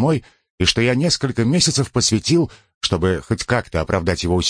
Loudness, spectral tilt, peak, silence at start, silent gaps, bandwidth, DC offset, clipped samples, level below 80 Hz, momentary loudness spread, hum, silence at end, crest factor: -18 LUFS; -4.5 dB/octave; -2 dBFS; 0 s; 0.50-0.58 s, 2.75-2.81 s; 10.5 kHz; under 0.1%; under 0.1%; -38 dBFS; 6 LU; none; 0 s; 16 dB